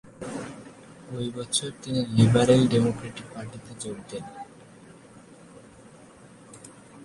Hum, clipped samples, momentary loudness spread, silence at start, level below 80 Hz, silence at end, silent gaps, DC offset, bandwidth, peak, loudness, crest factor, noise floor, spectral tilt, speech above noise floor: none; under 0.1%; 27 LU; 0.05 s; -56 dBFS; 0 s; none; under 0.1%; 11.5 kHz; -6 dBFS; -25 LUFS; 22 dB; -50 dBFS; -5.5 dB/octave; 26 dB